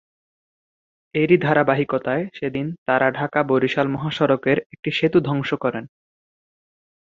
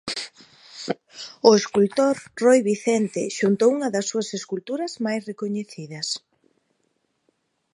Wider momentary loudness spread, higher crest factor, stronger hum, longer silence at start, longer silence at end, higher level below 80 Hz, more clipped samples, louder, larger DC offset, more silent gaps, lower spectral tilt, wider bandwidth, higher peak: second, 8 LU vs 14 LU; about the same, 20 dB vs 22 dB; neither; first, 1.15 s vs 0.05 s; second, 1.3 s vs 1.55 s; first, -60 dBFS vs -70 dBFS; neither; about the same, -21 LUFS vs -22 LUFS; neither; first, 2.78-2.86 s, 4.66-4.70 s, 4.79-4.83 s vs none; first, -7.5 dB/octave vs -4.5 dB/octave; second, 7.4 kHz vs 11.5 kHz; about the same, -2 dBFS vs 0 dBFS